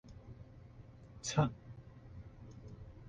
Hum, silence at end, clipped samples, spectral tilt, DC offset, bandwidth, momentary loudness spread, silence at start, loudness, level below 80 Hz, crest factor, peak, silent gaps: none; 0 s; under 0.1%; -5.5 dB/octave; under 0.1%; 9.4 kHz; 22 LU; 0.05 s; -37 LUFS; -60 dBFS; 26 dB; -18 dBFS; none